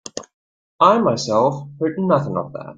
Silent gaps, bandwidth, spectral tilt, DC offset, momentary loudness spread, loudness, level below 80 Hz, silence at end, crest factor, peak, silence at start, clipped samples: 0.33-0.79 s; 9.2 kHz; -6 dB/octave; under 0.1%; 12 LU; -18 LUFS; -60 dBFS; 0.05 s; 18 dB; -2 dBFS; 0.15 s; under 0.1%